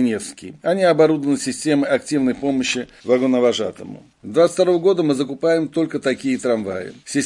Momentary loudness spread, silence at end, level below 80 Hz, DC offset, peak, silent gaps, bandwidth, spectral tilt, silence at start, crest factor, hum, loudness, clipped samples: 11 LU; 0 s; -60 dBFS; under 0.1%; -2 dBFS; none; 11.5 kHz; -5 dB/octave; 0 s; 16 dB; none; -19 LUFS; under 0.1%